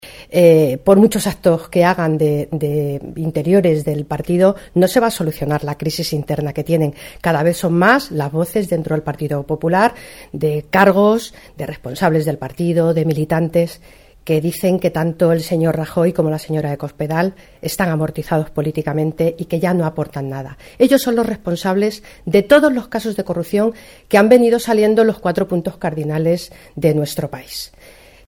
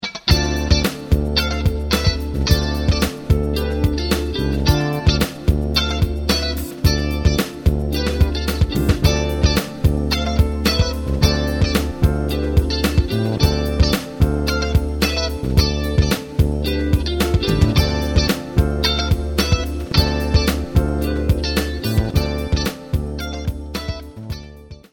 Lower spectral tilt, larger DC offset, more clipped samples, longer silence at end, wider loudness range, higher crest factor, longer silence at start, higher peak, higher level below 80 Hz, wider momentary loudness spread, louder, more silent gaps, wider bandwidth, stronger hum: about the same, -6.5 dB/octave vs -5.5 dB/octave; neither; neither; first, 0.6 s vs 0.15 s; first, 4 LU vs 1 LU; about the same, 16 dB vs 18 dB; about the same, 0.05 s vs 0 s; about the same, 0 dBFS vs 0 dBFS; second, -46 dBFS vs -22 dBFS; first, 12 LU vs 4 LU; about the same, -17 LUFS vs -19 LUFS; neither; about the same, 18 kHz vs 19 kHz; neither